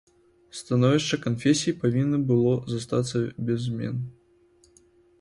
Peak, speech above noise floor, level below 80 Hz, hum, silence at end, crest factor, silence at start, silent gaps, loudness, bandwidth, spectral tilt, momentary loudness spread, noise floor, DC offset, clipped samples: -8 dBFS; 36 dB; -58 dBFS; none; 1.1 s; 18 dB; 0.55 s; none; -25 LUFS; 11.5 kHz; -6 dB/octave; 10 LU; -60 dBFS; under 0.1%; under 0.1%